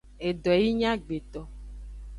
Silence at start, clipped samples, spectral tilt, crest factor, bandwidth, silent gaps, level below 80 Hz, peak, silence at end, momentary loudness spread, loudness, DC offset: 0.05 s; under 0.1%; -6.5 dB/octave; 18 dB; 11 kHz; none; -44 dBFS; -10 dBFS; 0 s; 21 LU; -27 LUFS; under 0.1%